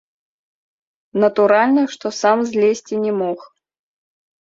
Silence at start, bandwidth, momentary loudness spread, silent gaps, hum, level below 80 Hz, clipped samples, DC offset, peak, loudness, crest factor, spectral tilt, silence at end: 1.15 s; 7.8 kHz; 10 LU; none; none; -68 dBFS; under 0.1%; under 0.1%; -2 dBFS; -17 LUFS; 18 dB; -5 dB/octave; 0.95 s